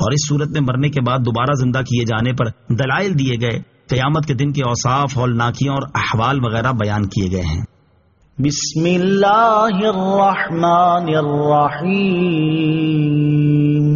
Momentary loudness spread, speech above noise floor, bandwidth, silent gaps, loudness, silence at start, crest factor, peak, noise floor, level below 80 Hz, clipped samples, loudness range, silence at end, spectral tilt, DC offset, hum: 6 LU; 39 dB; 7.2 kHz; none; -16 LUFS; 0 s; 12 dB; -4 dBFS; -55 dBFS; -42 dBFS; under 0.1%; 4 LU; 0 s; -6 dB/octave; under 0.1%; none